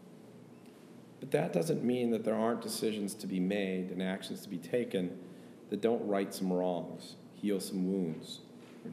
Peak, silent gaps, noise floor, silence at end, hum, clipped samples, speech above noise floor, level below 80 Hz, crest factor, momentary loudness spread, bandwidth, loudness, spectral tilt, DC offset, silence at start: -14 dBFS; none; -54 dBFS; 0 s; none; under 0.1%; 20 dB; -84 dBFS; 20 dB; 22 LU; 15.5 kHz; -35 LUFS; -6 dB/octave; under 0.1%; 0 s